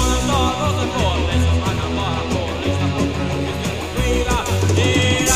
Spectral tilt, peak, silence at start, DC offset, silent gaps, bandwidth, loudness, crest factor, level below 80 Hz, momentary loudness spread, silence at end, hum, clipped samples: -4.5 dB/octave; -2 dBFS; 0 s; 0.7%; none; 15.5 kHz; -19 LUFS; 16 dB; -26 dBFS; 6 LU; 0 s; none; under 0.1%